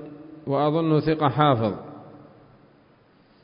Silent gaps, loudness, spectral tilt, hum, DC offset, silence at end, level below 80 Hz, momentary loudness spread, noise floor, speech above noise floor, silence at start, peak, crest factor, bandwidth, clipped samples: none; -22 LUFS; -11.5 dB/octave; none; under 0.1%; 1.2 s; -56 dBFS; 22 LU; -57 dBFS; 36 dB; 0 s; -4 dBFS; 20 dB; 5.4 kHz; under 0.1%